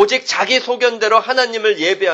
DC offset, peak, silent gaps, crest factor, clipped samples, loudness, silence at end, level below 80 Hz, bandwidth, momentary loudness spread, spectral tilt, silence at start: under 0.1%; 0 dBFS; none; 16 dB; under 0.1%; -15 LUFS; 0 s; -66 dBFS; 8.4 kHz; 3 LU; -1.5 dB/octave; 0 s